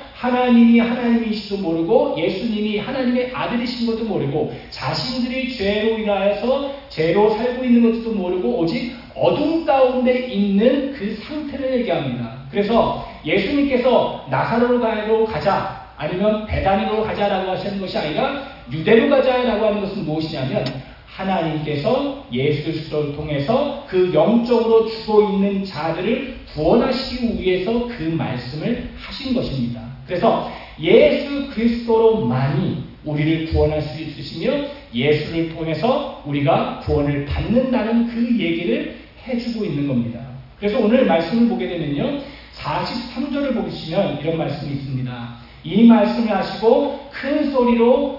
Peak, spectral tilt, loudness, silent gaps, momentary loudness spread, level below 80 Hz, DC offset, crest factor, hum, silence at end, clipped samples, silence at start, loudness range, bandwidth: -2 dBFS; -8 dB/octave; -19 LUFS; none; 11 LU; -42 dBFS; under 0.1%; 18 dB; none; 0 s; under 0.1%; 0 s; 4 LU; 5.8 kHz